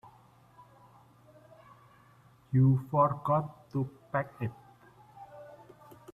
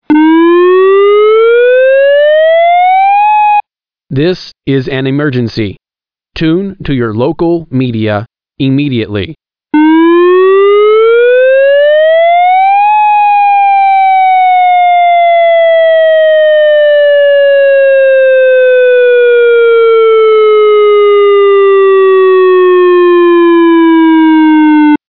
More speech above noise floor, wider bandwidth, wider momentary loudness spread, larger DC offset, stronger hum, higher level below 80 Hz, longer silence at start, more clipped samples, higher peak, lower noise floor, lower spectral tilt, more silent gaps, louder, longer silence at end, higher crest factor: second, 32 dB vs over 79 dB; second, 3.8 kHz vs 5.4 kHz; first, 26 LU vs 8 LU; second, under 0.1% vs 1%; neither; second, -64 dBFS vs -44 dBFS; first, 2.5 s vs 0.1 s; neither; second, -14 dBFS vs 0 dBFS; second, -61 dBFS vs under -90 dBFS; first, -10.5 dB/octave vs -8.5 dB/octave; neither; second, -30 LUFS vs -6 LUFS; first, 0.6 s vs 0.15 s; first, 20 dB vs 6 dB